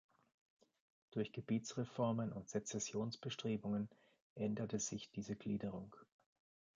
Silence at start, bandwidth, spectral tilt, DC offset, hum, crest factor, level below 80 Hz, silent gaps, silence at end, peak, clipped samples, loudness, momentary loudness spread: 1.1 s; 9.4 kHz; -5 dB/octave; under 0.1%; none; 18 dB; -76 dBFS; 4.22-4.36 s; 0.75 s; -26 dBFS; under 0.1%; -44 LUFS; 8 LU